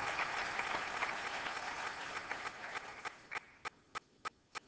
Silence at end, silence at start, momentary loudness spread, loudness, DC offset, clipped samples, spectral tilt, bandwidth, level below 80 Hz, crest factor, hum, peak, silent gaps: 0 s; 0 s; 11 LU; -41 LUFS; under 0.1%; under 0.1%; -1.5 dB/octave; 8 kHz; -70 dBFS; 20 dB; none; -22 dBFS; none